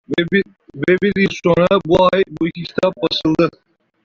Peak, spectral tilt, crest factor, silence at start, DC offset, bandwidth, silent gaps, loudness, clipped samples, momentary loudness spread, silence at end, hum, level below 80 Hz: -2 dBFS; -6.5 dB/octave; 14 dB; 0.1 s; under 0.1%; 7.4 kHz; none; -16 LUFS; under 0.1%; 8 LU; 0.55 s; none; -46 dBFS